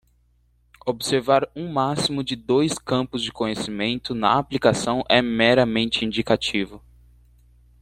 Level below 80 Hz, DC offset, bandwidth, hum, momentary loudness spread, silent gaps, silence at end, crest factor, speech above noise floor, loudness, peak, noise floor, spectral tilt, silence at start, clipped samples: -52 dBFS; under 0.1%; 14.5 kHz; 60 Hz at -45 dBFS; 9 LU; none; 1.05 s; 20 dB; 40 dB; -22 LUFS; -2 dBFS; -62 dBFS; -4.5 dB/octave; 0.85 s; under 0.1%